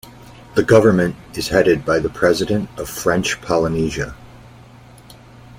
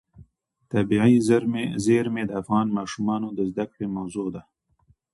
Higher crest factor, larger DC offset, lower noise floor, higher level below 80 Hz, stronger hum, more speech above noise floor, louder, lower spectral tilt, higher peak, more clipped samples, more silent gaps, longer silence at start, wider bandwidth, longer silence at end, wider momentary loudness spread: about the same, 18 dB vs 18 dB; neither; second, -43 dBFS vs -64 dBFS; first, -42 dBFS vs -56 dBFS; neither; second, 26 dB vs 41 dB; first, -17 LUFS vs -24 LUFS; about the same, -5.5 dB/octave vs -6.5 dB/octave; first, 0 dBFS vs -6 dBFS; neither; neither; about the same, 0.05 s vs 0.15 s; first, 16.5 kHz vs 11.5 kHz; second, 0.05 s vs 0.7 s; about the same, 11 LU vs 12 LU